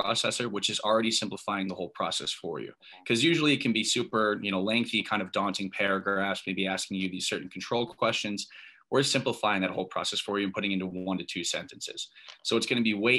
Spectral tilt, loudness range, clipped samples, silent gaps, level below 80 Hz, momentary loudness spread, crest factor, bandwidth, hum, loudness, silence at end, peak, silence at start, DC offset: -3.5 dB/octave; 3 LU; under 0.1%; none; -72 dBFS; 10 LU; 20 dB; 12.5 kHz; none; -29 LUFS; 0 s; -10 dBFS; 0 s; under 0.1%